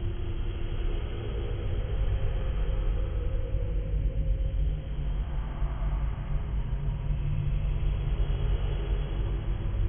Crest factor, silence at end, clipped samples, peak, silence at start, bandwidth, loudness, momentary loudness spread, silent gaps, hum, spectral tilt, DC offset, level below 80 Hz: 12 dB; 0 s; under 0.1%; -16 dBFS; 0 s; 3.5 kHz; -33 LUFS; 4 LU; none; none; -11 dB/octave; under 0.1%; -30 dBFS